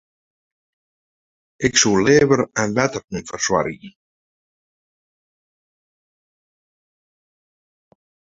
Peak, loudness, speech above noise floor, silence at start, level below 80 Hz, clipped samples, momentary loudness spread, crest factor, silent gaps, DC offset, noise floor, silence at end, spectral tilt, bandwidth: -2 dBFS; -18 LUFS; over 72 dB; 1.6 s; -54 dBFS; under 0.1%; 14 LU; 22 dB; 3.04-3.08 s; under 0.1%; under -90 dBFS; 4.4 s; -3.5 dB/octave; 8 kHz